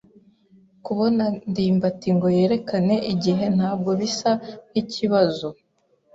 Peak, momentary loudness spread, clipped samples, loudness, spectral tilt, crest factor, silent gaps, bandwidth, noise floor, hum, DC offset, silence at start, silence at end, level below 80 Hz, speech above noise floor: -6 dBFS; 8 LU; under 0.1%; -22 LUFS; -6.5 dB/octave; 16 dB; none; 7.8 kHz; -60 dBFS; none; under 0.1%; 0.85 s; 0.6 s; -60 dBFS; 39 dB